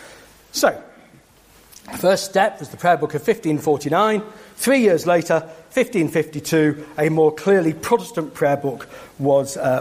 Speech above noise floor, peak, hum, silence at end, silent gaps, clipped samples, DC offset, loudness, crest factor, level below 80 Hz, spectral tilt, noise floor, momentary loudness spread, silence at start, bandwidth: 32 dB; -2 dBFS; none; 0 s; none; under 0.1%; under 0.1%; -19 LUFS; 18 dB; -58 dBFS; -5 dB/octave; -51 dBFS; 9 LU; 0 s; 15.5 kHz